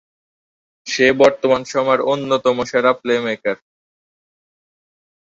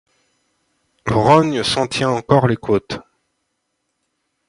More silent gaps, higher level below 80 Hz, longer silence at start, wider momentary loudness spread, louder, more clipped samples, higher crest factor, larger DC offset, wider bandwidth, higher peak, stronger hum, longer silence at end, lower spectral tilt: neither; second, -58 dBFS vs -48 dBFS; second, 0.85 s vs 1.05 s; about the same, 12 LU vs 14 LU; about the same, -17 LUFS vs -17 LUFS; neither; about the same, 18 dB vs 18 dB; neither; second, 7.8 kHz vs 11.5 kHz; about the same, 0 dBFS vs -2 dBFS; neither; first, 1.75 s vs 1.5 s; second, -4 dB/octave vs -5.5 dB/octave